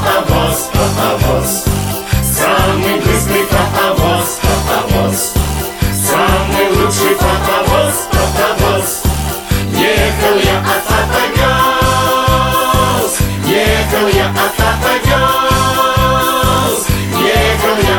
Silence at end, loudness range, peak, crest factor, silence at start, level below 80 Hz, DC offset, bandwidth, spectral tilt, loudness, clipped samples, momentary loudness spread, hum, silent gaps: 0 s; 1 LU; 0 dBFS; 12 dB; 0 s; -22 dBFS; under 0.1%; 18 kHz; -4 dB/octave; -12 LUFS; under 0.1%; 4 LU; none; none